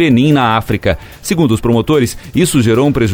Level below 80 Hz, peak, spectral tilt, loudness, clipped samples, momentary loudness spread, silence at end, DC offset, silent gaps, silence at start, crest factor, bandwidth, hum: -32 dBFS; 0 dBFS; -6 dB/octave; -12 LUFS; under 0.1%; 7 LU; 0 s; under 0.1%; none; 0 s; 12 dB; 19 kHz; none